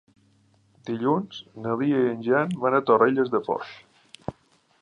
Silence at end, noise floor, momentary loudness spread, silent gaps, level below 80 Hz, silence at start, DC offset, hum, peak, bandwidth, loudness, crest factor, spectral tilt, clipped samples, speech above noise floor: 0.5 s; -62 dBFS; 19 LU; none; -64 dBFS; 0.85 s; under 0.1%; none; -6 dBFS; 10 kHz; -24 LUFS; 20 dB; -7.5 dB/octave; under 0.1%; 39 dB